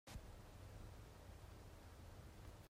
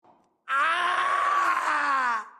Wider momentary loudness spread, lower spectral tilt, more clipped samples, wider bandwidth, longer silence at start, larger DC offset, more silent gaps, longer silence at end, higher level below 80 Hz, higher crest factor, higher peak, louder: about the same, 3 LU vs 2 LU; first, -5 dB/octave vs -0.5 dB/octave; neither; first, 16 kHz vs 12.5 kHz; second, 0.05 s vs 0.45 s; neither; neither; about the same, 0 s vs 0.1 s; first, -62 dBFS vs -84 dBFS; about the same, 16 dB vs 12 dB; second, -42 dBFS vs -14 dBFS; second, -60 LUFS vs -24 LUFS